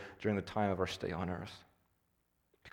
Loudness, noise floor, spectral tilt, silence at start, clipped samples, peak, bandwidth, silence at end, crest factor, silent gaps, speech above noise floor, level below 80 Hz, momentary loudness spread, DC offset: -37 LUFS; -79 dBFS; -6 dB/octave; 0 s; under 0.1%; -20 dBFS; 17.5 kHz; 0.05 s; 20 dB; none; 42 dB; -64 dBFS; 12 LU; under 0.1%